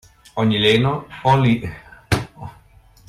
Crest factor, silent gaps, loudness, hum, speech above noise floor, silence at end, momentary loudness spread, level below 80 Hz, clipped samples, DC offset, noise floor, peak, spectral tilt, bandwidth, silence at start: 16 dB; none; -18 LUFS; none; 32 dB; 0.6 s; 19 LU; -44 dBFS; under 0.1%; under 0.1%; -49 dBFS; -4 dBFS; -6 dB/octave; 14.5 kHz; 0.35 s